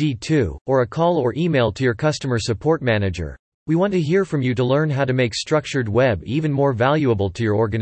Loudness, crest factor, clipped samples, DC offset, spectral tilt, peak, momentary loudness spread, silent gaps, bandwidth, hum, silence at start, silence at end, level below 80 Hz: -20 LUFS; 16 dB; under 0.1%; under 0.1%; -6.5 dB/octave; -4 dBFS; 4 LU; 0.61-0.65 s, 3.39-3.66 s; 8.8 kHz; none; 0 s; 0 s; -46 dBFS